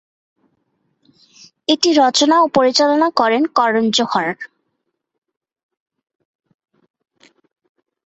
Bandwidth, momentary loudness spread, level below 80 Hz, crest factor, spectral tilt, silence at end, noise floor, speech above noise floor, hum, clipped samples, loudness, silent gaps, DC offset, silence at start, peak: 8.2 kHz; 11 LU; -64 dBFS; 18 dB; -3 dB/octave; 3.6 s; -74 dBFS; 59 dB; none; under 0.1%; -15 LUFS; none; under 0.1%; 1.7 s; 0 dBFS